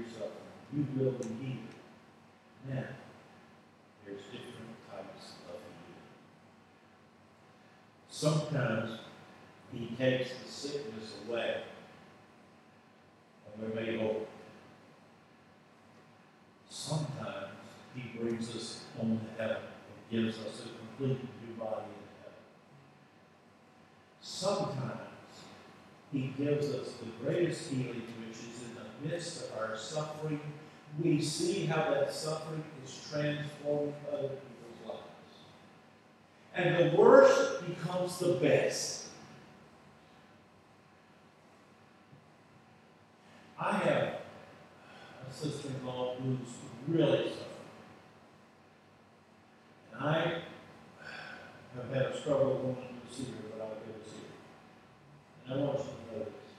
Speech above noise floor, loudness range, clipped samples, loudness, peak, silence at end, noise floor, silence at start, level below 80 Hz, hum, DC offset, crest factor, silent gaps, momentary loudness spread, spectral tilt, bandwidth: 29 dB; 16 LU; under 0.1%; -34 LUFS; -8 dBFS; 0 s; -61 dBFS; 0 s; -80 dBFS; none; under 0.1%; 28 dB; none; 22 LU; -5.5 dB/octave; 13 kHz